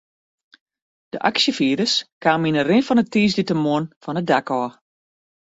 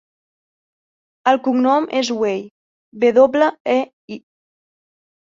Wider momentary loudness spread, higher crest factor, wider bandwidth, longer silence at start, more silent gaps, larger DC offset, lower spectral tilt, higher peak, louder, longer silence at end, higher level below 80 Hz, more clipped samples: second, 8 LU vs 17 LU; about the same, 18 dB vs 18 dB; about the same, 8 kHz vs 7.6 kHz; about the same, 1.15 s vs 1.25 s; second, 2.12-2.21 s, 3.96-4.01 s vs 2.51-2.92 s, 3.60-3.65 s, 3.93-4.08 s; neither; about the same, -5 dB/octave vs -4.5 dB/octave; about the same, -4 dBFS vs -2 dBFS; second, -20 LUFS vs -17 LUFS; second, 0.9 s vs 1.2 s; first, -60 dBFS vs -66 dBFS; neither